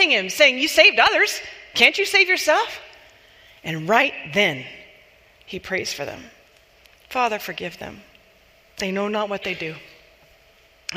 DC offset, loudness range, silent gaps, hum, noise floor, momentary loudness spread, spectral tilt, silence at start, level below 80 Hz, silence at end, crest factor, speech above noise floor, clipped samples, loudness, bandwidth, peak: under 0.1%; 13 LU; none; none; -55 dBFS; 21 LU; -2.5 dB/octave; 0 s; -60 dBFS; 0 s; 22 dB; 34 dB; under 0.1%; -19 LUFS; 15.5 kHz; 0 dBFS